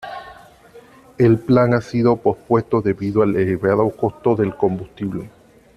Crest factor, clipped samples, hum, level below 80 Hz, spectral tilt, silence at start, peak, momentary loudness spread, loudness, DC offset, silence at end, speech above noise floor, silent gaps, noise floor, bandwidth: 16 dB; under 0.1%; none; -50 dBFS; -9 dB/octave; 0 s; -2 dBFS; 12 LU; -18 LUFS; under 0.1%; 0.5 s; 28 dB; none; -45 dBFS; 12 kHz